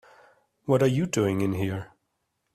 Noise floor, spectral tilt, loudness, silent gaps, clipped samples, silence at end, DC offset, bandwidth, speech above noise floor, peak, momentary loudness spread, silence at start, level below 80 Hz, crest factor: -77 dBFS; -6.5 dB/octave; -26 LUFS; none; under 0.1%; 0.7 s; under 0.1%; 15 kHz; 53 dB; -8 dBFS; 16 LU; 0.65 s; -60 dBFS; 18 dB